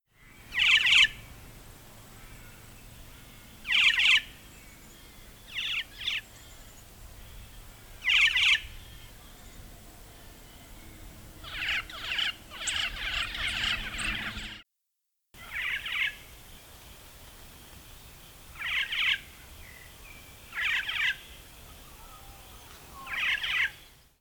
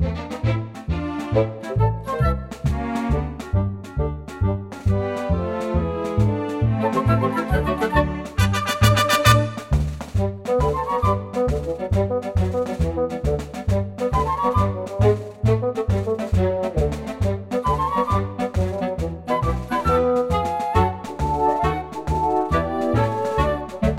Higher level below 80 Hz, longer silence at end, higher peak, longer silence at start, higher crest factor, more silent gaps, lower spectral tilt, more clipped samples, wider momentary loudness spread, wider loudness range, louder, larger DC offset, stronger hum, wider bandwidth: second, -52 dBFS vs -30 dBFS; first, 0.35 s vs 0 s; second, -10 dBFS vs 0 dBFS; first, 0.4 s vs 0 s; about the same, 22 dB vs 20 dB; neither; second, 0 dB/octave vs -6.5 dB/octave; neither; first, 28 LU vs 6 LU; first, 9 LU vs 4 LU; second, -26 LUFS vs -22 LUFS; neither; neither; first, over 20 kHz vs 16 kHz